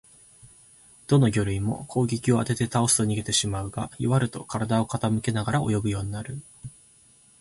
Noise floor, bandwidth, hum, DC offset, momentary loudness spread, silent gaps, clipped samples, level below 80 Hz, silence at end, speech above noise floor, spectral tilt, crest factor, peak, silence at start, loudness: -57 dBFS; 12 kHz; none; under 0.1%; 14 LU; none; under 0.1%; -48 dBFS; 0.7 s; 32 dB; -5 dB/octave; 18 dB; -8 dBFS; 0.45 s; -25 LUFS